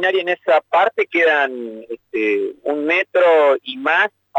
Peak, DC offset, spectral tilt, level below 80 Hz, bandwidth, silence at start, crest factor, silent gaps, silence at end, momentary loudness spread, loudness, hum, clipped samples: -6 dBFS; under 0.1%; -4 dB/octave; -76 dBFS; 8 kHz; 0 s; 12 dB; none; 0 s; 9 LU; -17 LUFS; none; under 0.1%